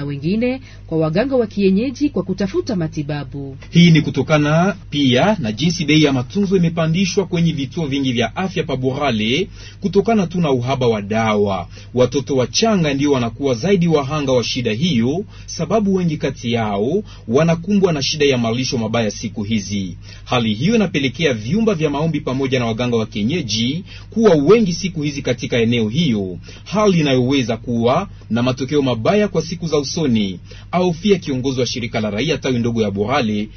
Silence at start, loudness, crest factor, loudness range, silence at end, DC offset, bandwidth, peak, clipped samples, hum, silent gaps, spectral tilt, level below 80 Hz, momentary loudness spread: 0 s; -17 LUFS; 16 dB; 3 LU; 0 s; under 0.1%; 6.6 kHz; 0 dBFS; under 0.1%; none; none; -6 dB/octave; -42 dBFS; 8 LU